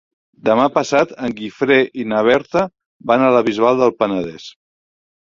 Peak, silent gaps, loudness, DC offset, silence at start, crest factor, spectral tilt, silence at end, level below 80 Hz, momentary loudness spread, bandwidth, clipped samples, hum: 0 dBFS; 2.86-3.00 s; -16 LUFS; under 0.1%; 0.45 s; 16 dB; -5.5 dB/octave; 0.7 s; -56 dBFS; 10 LU; 7.6 kHz; under 0.1%; none